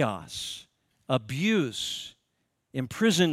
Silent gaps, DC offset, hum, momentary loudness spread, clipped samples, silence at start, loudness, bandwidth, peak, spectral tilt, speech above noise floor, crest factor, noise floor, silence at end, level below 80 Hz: none; under 0.1%; none; 12 LU; under 0.1%; 0 s; -29 LUFS; 15.5 kHz; -8 dBFS; -4.5 dB/octave; 49 dB; 20 dB; -77 dBFS; 0 s; -64 dBFS